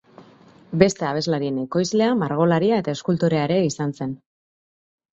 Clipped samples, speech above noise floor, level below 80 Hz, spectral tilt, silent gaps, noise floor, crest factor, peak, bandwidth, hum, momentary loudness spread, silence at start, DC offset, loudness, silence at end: under 0.1%; 30 dB; -58 dBFS; -6 dB/octave; none; -50 dBFS; 22 dB; 0 dBFS; 8 kHz; none; 9 LU; 0.2 s; under 0.1%; -21 LUFS; 0.95 s